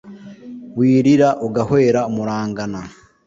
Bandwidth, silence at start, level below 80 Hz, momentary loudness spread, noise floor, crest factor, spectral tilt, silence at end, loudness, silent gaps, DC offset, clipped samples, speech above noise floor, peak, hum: 7.6 kHz; 0.05 s; -52 dBFS; 23 LU; -36 dBFS; 14 dB; -7.5 dB/octave; 0.35 s; -17 LUFS; none; under 0.1%; under 0.1%; 20 dB; -2 dBFS; none